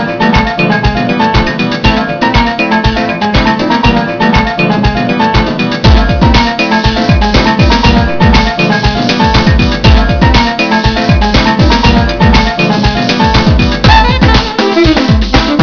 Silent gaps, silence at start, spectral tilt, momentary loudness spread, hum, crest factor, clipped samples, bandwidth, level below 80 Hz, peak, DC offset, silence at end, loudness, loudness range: none; 0 s; -6 dB/octave; 3 LU; none; 8 dB; 2%; 5.4 kHz; -14 dBFS; 0 dBFS; under 0.1%; 0 s; -8 LUFS; 2 LU